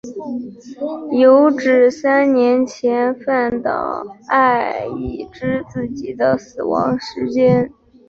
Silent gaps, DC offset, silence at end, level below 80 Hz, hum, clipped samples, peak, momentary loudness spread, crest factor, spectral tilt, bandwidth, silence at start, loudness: none; under 0.1%; 0.4 s; -48 dBFS; none; under 0.1%; -2 dBFS; 14 LU; 14 dB; -7 dB/octave; 7.2 kHz; 0.05 s; -17 LUFS